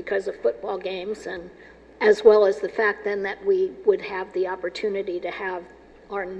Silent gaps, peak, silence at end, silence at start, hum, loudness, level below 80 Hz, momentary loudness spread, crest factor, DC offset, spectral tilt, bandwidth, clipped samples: none; -2 dBFS; 0 s; 0 s; none; -23 LUFS; -58 dBFS; 15 LU; 22 dB; under 0.1%; -5 dB/octave; 8.4 kHz; under 0.1%